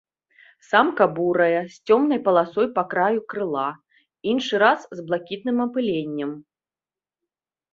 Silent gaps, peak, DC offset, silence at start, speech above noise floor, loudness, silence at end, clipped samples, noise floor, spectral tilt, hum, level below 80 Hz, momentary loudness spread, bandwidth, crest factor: none; -2 dBFS; under 0.1%; 0.7 s; over 69 dB; -22 LUFS; 1.3 s; under 0.1%; under -90 dBFS; -6 dB/octave; none; -68 dBFS; 10 LU; 7.6 kHz; 20 dB